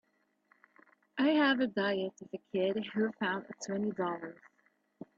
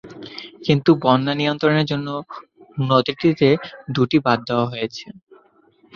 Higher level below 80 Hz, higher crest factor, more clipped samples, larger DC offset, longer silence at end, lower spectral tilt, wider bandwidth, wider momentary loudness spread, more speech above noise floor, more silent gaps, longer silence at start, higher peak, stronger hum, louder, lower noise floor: second, -80 dBFS vs -58 dBFS; about the same, 20 dB vs 18 dB; neither; neither; about the same, 0.85 s vs 0.85 s; second, -5 dB/octave vs -7.5 dB/octave; first, 7.8 kHz vs 7 kHz; about the same, 16 LU vs 18 LU; about the same, 39 dB vs 37 dB; neither; first, 1.15 s vs 0.05 s; second, -16 dBFS vs -2 dBFS; neither; second, -33 LUFS vs -19 LUFS; first, -72 dBFS vs -56 dBFS